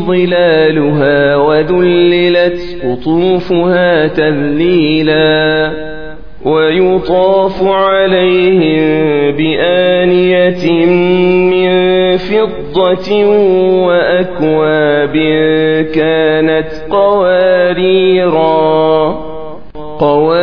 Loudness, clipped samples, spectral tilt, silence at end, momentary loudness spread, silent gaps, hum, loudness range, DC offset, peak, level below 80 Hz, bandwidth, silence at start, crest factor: -10 LUFS; under 0.1%; -8.5 dB/octave; 0 s; 5 LU; none; none; 1 LU; 3%; 0 dBFS; -38 dBFS; 5.4 kHz; 0 s; 10 dB